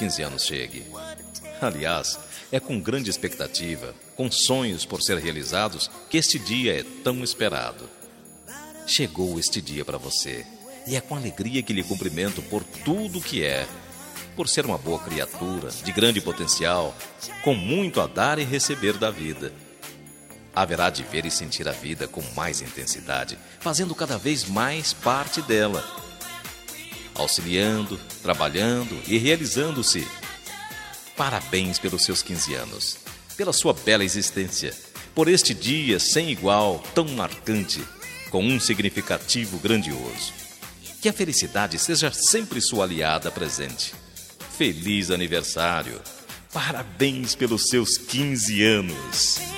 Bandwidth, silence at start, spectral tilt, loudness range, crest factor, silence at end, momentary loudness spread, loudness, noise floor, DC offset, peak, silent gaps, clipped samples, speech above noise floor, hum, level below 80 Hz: 16 kHz; 0 s; -3 dB/octave; 5 LU; 24 dB; 0 s; 15 LU; -24 LUFS; -46 dBFS; under 0.1%; -2 dBFS; none; under 0.1%; 22 dB; none; -54 dBFS